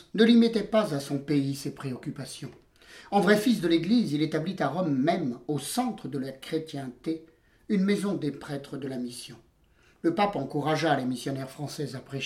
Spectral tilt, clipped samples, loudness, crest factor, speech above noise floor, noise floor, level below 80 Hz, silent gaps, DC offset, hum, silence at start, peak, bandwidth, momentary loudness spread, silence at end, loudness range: -6 dB/octave; under 0.1%; -28 LUFS; 20 dB; 35 dB; -62 dBFS; -64 dBFS; none; under 0.1%; none; 0.15 s; -8 dBFS; 15.5 kHz; 14 LU; 0 s; 5 LU